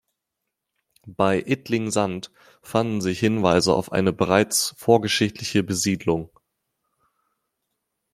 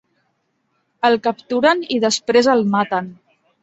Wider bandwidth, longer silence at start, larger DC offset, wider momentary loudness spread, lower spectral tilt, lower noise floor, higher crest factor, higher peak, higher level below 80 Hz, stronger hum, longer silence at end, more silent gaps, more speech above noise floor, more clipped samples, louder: first, 16 kHz vs 8.2 kHz; about the same, 1.05 s vs 1.05 s; neither; about the same, 8 LU vs 7 LU; about the same, -4.5 dB/octave vs -4 dB/octave; first, -82 dBFS vs -68 dBFS; about the same, 22 dB vs 18 dB; about the same, -2 dBFS vs -2 dBFS; about the same, -58 dBFS vs -62 dBFS; neither; first, 1.85 s vs 0.5 s; neither; first, 60 dB vs 51 dB; neither; second, -22 LUFS vs -17 LUFS